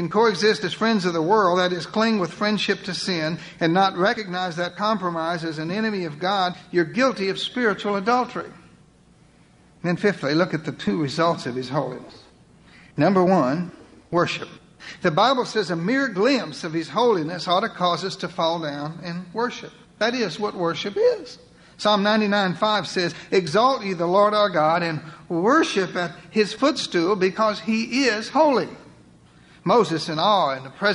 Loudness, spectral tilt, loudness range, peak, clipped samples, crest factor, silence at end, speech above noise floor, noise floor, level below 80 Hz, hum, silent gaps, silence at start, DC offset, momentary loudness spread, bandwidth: -22 LUFS; -5 dB/octave; 4 LU; -6 dBFS; under 0.1%; 16 dB; 0 s; 32 dB; -54 dBFS; -62 dBFS; none; none; 0 s; under 0.1%; 10 LU; 11 kHz